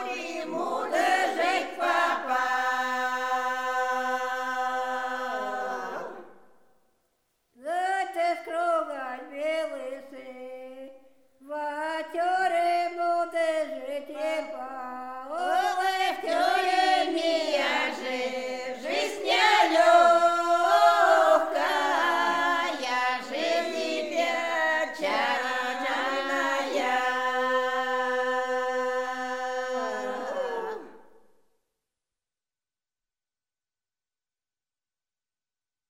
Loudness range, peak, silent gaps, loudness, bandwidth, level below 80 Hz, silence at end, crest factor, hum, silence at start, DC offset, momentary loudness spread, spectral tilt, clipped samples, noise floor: 12 LU; -8 dBFS; none; -26 LUFS; 16 kHz; -80 dBFS; 4.9 s; 20 dB; none; 0 s; 0.2%; 14 LU; -1.5 dB/octave; under 0.1%; under -90 dBFS